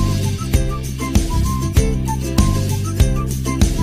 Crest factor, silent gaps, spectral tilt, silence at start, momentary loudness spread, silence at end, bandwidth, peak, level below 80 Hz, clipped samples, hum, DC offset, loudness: 14 dB; none; -5.5 dB/octave; 0 s; 4 LU; 0 s; 16 kHz; -2 dBFS; -20 dBFS; under 0.1%; none; under 0.1%; -19 LUFS